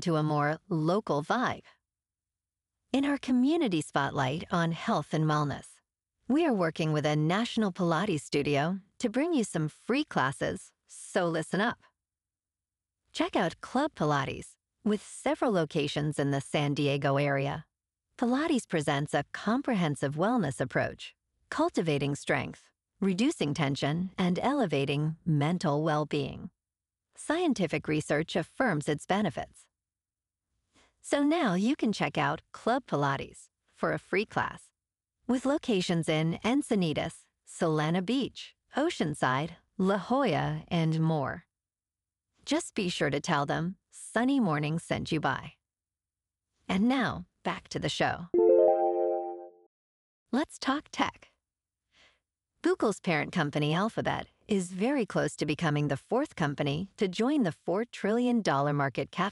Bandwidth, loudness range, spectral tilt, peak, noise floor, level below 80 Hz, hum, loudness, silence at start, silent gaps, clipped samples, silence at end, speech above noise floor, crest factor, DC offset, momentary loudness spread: 12 kHz; 4 LU; -6 dB/octave; -10 dBFS; under -90 dBFS; -62 dBFS; none; -30 LUFS; 0 s; 49.66-50.26 s; under 0.1%; 0 s; over 61 dB; 20 dB; under 0.1%; 7 LU